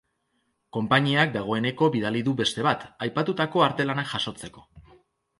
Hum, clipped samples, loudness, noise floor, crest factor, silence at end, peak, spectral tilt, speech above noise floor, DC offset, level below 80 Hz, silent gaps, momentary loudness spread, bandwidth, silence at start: none; under 0.1%; -25 LUFS; -73 dBFS; 20 dB; 0.6 s; -6 dBFS; -5.5 dB/octave; 49 dB; under 0.1%; -62 dBFS; none; 10 LU; 11.5 kHz; 0.75 s